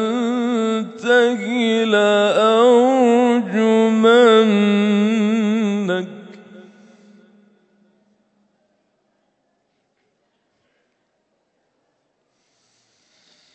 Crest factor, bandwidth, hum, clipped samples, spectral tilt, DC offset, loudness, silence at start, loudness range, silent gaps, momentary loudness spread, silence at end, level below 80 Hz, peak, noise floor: 16 dB; 8.6 kHz; none; under 0.1%; -5.5 dB/octave; under 0.1%; -16 LUFS; 0 s; 11 LU; none; 9 LU; 6.95 s; -76 dBFS; -2 dBFS; -68 dBFS